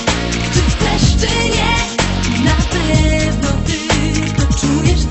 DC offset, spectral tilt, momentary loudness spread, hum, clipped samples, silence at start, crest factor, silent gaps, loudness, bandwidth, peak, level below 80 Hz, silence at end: 0.1%; -4.5 dB/octave; 3 LU; none; under 0.1%; 0 s; 14 dB; none; -15 LUFS; 8.4 kHz; 0 dBFS; -20 dBFS; 0 s